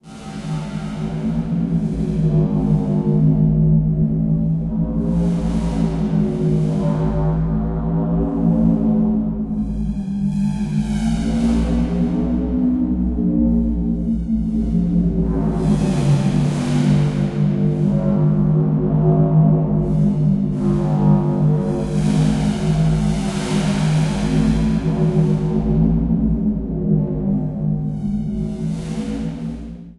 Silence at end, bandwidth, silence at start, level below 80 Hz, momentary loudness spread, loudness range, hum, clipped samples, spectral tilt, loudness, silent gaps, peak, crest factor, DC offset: 0.05 s; 11 kHz; 0.05 s; -28 dBFS; 7 LU; 3 LU; none; under 0.1%; -8.5 dB/octave; -18 LUFS; none; -4 dBFS; 14 dB; under 0.1%